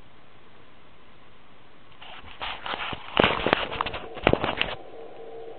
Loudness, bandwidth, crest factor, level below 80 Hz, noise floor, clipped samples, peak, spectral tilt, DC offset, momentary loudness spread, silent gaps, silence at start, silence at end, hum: -26 LUFS; 4.6 kHz; 28 dB; -48 dBFS; -54 dBFS; under 0.1%; -2 dBFS; -2 dB/octave; 0.9%; 21 LU; none; 1.9 s; 0 s; none